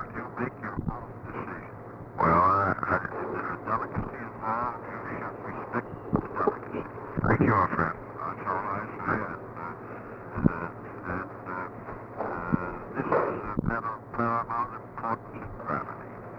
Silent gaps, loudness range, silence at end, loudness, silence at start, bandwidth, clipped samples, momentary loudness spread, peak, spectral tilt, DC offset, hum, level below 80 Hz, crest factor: none; 5 LU; 0 s; -30 LUFS; 0 s; 6.2 kHz; under 0.1%; 14 LU; -6 dBFS; -10 dB/octave; under 0.1%; none; -50 dBFS; 24 dB